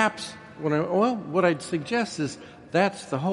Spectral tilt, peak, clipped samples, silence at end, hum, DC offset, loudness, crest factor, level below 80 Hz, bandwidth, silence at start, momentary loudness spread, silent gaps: -5.5 dB/octave; -6 dBFS; under 0.1%; 0 s; none; under 0.1%; -26 LUFS; 20 dB; -64 dBFS; 11.5 kHz; 0 s; 9 LU; none